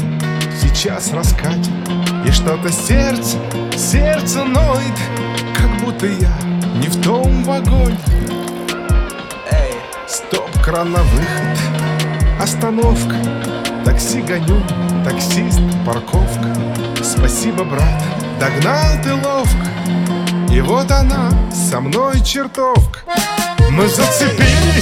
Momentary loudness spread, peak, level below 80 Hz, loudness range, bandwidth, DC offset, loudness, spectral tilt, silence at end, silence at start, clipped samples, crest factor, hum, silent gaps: 6 LU; 0 dBFS; -18 dBFS; 2 LU; 16.5 kHz; under 0.1%; -15 LUFS; -5 dB/octave; 0 s; 0 s; under 0.1%; 14 dB; none; none